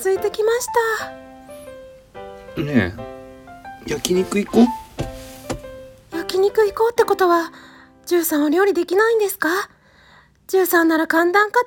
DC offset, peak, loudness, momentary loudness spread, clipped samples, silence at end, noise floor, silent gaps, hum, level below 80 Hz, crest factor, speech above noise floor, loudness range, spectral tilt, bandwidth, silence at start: under 0.1%; 0 dBFS; -18 LUFS; 22 LU; under 0.1%; 0 s; -51 dBFS; none; none; -48 dBFS; 20 dB; 33 dB; 7 LU; -4.5 dB/octave; 18 kHz; 0 s